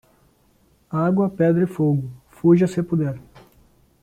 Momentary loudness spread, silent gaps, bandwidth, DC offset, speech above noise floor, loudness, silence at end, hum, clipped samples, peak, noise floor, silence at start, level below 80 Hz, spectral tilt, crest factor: 11 LU; none; 9.6 kHz; under 0.1%; 40 dB; -20 LUFS; 0.8 s; none; under 0.1%; -4 dBFS; -59 dBFS; 0.9 s; -56 dBFS; -9.5 dB/octave; 16 dB